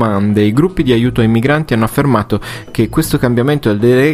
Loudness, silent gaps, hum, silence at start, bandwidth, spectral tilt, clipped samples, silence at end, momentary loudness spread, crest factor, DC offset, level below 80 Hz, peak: -13 LUFS; none; none; 0 s; 15.5 kHz; -7 dB/octave; under 0.1%; 0 s; 5 LU; 12 dB; under 0.1%; -32 dBFS; 0 dBFS